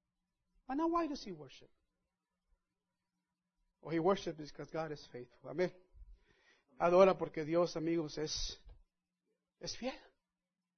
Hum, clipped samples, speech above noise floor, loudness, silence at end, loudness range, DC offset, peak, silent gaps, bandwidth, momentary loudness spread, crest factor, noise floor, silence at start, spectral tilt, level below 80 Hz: none; under 0.1%; over 54 dB; -36 LUFS; 0.8 s; 8 LU; under 0.1%; -14 dBFS; none; 6.4 kHz; 21 LU; 26 dB; under -90 dBFS; 0.7 s; -4.5 dB/octave; -60 dBFS